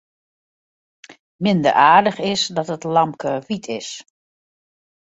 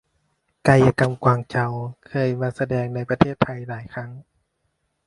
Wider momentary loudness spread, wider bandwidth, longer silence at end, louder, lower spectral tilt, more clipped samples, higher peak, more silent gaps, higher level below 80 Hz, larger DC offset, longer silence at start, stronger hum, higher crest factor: about the same, 16 LU vs 16 LU; second, 8 kHz vs 11.5 kHz; first, 1.1 s vs 0.85 s; first, -18 LUFS vs -21 LUFS; second, -4.5 dB/octave vs -7.5 dB/octave; neither; about the same, -2 dBFS vs 0 dBFS; first, 1.19-1.39 s vs none; second, -62 dBFS vs -50 dBFS; neither; first, 1.1 s vs 0.65 s; neither; about the same, 20 dB vs 22 dB